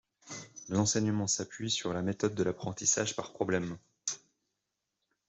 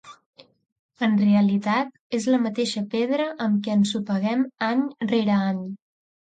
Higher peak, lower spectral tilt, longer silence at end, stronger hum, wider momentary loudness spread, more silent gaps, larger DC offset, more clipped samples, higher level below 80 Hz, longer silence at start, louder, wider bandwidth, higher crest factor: second, -14 dBFS vs -10 dBFS; second, -3.5 dB/octave vs -6 dB/octave; first, 1.1 s vs 0.55 s; neither; first, 15 LU vs 8 LU; second, none vs 0.26-0.33 s, 0.72-0.89 s, 1.99-2.10 s; neither; neither; about the same, -68 dBFS vs -70 dBFS; first, 0.25 s vs 0.05 s; second, -32 LUFS vs -23 LUFS; second, 8.2 kHz vs 9.2 kHz; first, 20 dB vs 14 dB